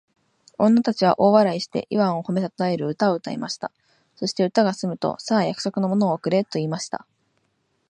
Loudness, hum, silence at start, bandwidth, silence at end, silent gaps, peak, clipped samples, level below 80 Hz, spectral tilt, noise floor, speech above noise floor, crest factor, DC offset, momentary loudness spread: -22 LUFS; none; 0.6 s; 10 kHz; 0.95 s; none; -2 dBFS; under 0.1%; -68 dBFS; -6 dB/octave; -70 dBFS; 48 dB; 20 dB; under 0.1%; 11 LU